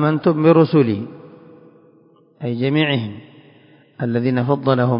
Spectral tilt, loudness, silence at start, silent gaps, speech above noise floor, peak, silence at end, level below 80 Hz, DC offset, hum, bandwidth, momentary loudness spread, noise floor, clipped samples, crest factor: -12.5 dB/octave; -17 LUFS; 0 s; none; 36 dB; -2 dBFS; 0 s; -60 dBFS; under 0.1%; none; 5.4 kHz; 16 LU; -52 dBFS; under 0.1%; 18 dB